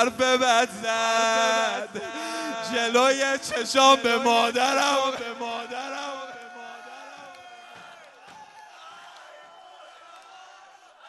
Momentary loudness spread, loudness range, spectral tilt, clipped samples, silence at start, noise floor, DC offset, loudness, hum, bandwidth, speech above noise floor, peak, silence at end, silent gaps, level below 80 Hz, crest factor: 25 LU; 21 LU; -1 dB/octave; under 0.1%; 0 s; -51 dBFS; under 0.1%; -23 LUFS; none; 12 kHz; 28 dB; -4 dBFS; 0 s; none; -72 dBFS; 22 dB